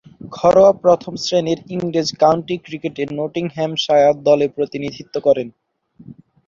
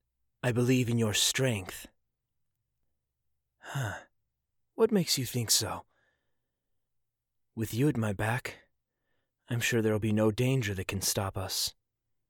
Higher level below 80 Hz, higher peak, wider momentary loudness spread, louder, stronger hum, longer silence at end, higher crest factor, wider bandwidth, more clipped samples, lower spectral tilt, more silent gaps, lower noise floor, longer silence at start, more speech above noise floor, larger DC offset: first, -54 dBFS vs -62 dBFS; first, 0 dBFS vs -14 dBFS; about the same, 13 LU vs 13 LU; first, -17 LUFS vs -30 LUFS; neither; second, 0.35 s vs 0.6 s; about the same, 16 dB vs 18 dB; second, 7.6 kHz vs 19 kHz; neither; first, -5.5 dB/octave vs -4 dB/octave; neither; second, -45 dBFS vs -83 dBFS; second, 0.25 s vs 0.45 s; second, 28 dB vs 53 dB; neither